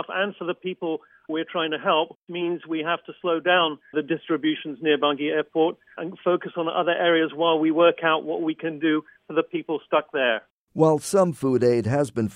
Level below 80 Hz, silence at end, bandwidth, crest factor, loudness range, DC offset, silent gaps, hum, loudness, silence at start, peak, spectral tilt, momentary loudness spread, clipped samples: -68 dBFS; 0 s; 13.5 kHz; 18 dB; 3 LU; under 0.1%; 2.16-2.27 s, 10.50-10.67 s; none; -24 LUFS; 0 s; -6 dBFS; -5.5 dB/octave; 10 LU; under 0.1%